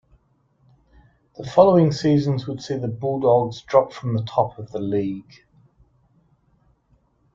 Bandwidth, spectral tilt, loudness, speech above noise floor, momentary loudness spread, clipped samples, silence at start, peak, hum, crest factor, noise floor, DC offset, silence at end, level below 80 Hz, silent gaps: 7.6 kHz; -8 dB/octave; -21 LUFS; 43 dB; 13 LU; under 0.1%; 1.4 s; -2 dBFS; none; 20 dB; -63 dBFS; under 0.1%; 2.15 s; -58 dBFS; none